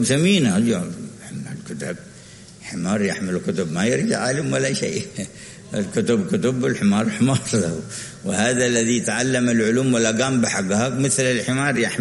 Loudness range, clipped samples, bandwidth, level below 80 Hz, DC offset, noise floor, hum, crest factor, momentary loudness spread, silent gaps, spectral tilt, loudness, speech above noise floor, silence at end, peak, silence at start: 5 LU; under 0.1%; 11.5 kHz; -56 dBFS; under 0.1%; -42 dBFS; none; 18 dB; 14 LU; none; -4.5 dB/octave; -20 LUFS; 22 dB; 0 s; -2 dBFS; 0 s